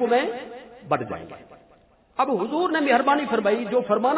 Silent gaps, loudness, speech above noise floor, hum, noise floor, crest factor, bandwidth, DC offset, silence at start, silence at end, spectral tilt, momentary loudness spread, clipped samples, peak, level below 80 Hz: none; -23 LUFS; 34 dB; none; -57 dBFS; 16 dB; 4 kHz; under 0.1%; 0 s; 0 s; -9 dB/octave; 16 LU; under 0.1%; -6 dBFS; -62 dBFS